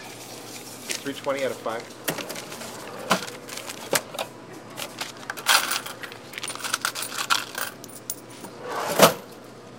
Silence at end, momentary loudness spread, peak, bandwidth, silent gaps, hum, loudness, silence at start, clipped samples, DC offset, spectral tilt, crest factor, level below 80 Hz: 0 s; 17 LU; 0 dBFS; 17 kHz; none; none; -26 LUFS; 0 s; under 0.1%; under 0.1%; -2 dB/octave; 28 dB; -68 dBFS